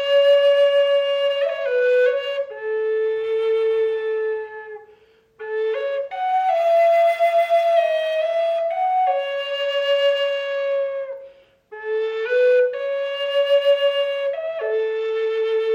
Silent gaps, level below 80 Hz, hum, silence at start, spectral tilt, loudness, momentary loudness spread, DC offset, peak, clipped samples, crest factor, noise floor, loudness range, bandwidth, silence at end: none; -74 dBFS; none; 0 s; -1 dB/octave; -20 LUFS; 10 LU; under 0.1%; -8 dBFS; under 0.1%; 12 dB; -54 dBFS; 5 LU; 15.5 kHz; 0 s